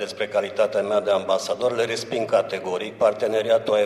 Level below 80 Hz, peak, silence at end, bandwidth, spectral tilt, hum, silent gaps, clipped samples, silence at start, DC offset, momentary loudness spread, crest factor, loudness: -68 dBFS; -6 dBFS; 0 s; 13 kHz; -4 dB/octave; none; none; under 0.1%; 0 s; under 0.1%; 5 LU; 16 dB; -23 LUFS